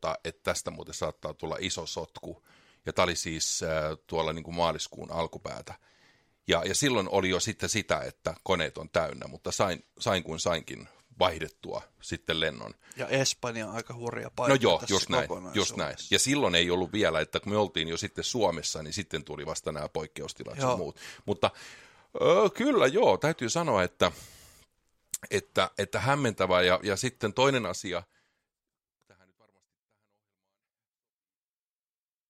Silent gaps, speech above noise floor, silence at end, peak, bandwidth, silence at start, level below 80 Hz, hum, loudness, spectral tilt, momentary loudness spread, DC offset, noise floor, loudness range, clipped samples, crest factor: none; over 61 dB; 4.25 s; -8 dBFS; 16 kHz; 0 s; -58 dBFS; none; -29 LUFS; -3.5 dB/octave; 15 LU; under 0.1%; under -90 dBFS; 6 LU; under 0.1%; 24 dB